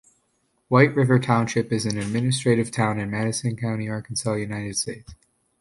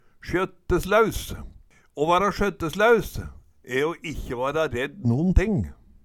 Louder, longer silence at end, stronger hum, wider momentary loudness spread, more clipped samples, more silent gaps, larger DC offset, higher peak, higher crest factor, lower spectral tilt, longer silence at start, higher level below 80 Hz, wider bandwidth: about the same, -23 LUFS vs -24 LUFS; first, 0.45 s vs 0.3 s; neither; second, 9 LU vs 16 LU; neither; neither; neither; about the same, -2 dBFS vs -4 dBFS; about the same, 20 dB vs 20 dB; about the same, -5.5 dB/octave vs -6 dB/octave; first, 0.7 s vs 0.25 s; second, -54 dBFS vs -34 dBFS; second, 11.5 kHz vs 18 kHz